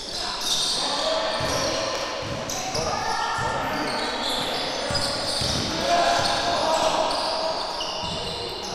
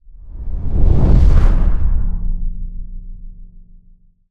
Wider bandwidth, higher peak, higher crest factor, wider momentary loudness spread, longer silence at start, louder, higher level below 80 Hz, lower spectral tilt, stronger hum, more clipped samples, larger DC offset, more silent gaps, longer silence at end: first, 16 kHz vs 3.5 kHz; second, -8 dBFS vs 0 dBFS; about the same, 16 dB vs 14 dB; second, 6 LU vs 24 LU; about the same, 0 s vs 0.1 s; second, -24 LUFS vs -18 LUFS; second, -46 dBFS vs -16 dBFS; second, -2.5 dB/octave vs -9.5 dB/octave; neither; neither; neither; neither; second, 0 s vs 0.85 s